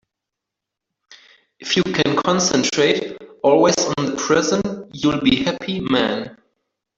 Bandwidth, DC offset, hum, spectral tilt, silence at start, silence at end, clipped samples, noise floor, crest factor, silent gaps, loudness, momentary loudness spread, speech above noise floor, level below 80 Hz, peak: 8 kHz; under 0.1%; none; -4 dB/octave; 1.1 s; 0.65 s; under 0.1%; -83 dBFS; 18 dB; none; -18 LUFS; 9 LU; 65 dB; -52 dBFS; -2 dBFS